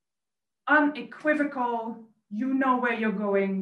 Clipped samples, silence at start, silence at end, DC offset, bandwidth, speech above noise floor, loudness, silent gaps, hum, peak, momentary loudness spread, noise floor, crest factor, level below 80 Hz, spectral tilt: under 0.1%; 0.65 s; 0 s; under 0.1%; 8.2 kHz; over 64 dB; -26 LUFS; none; none; -10 dBFS; 16 LU; under -90 dBFS; 16 dB; -78 dBFS; -7.5 dB/octave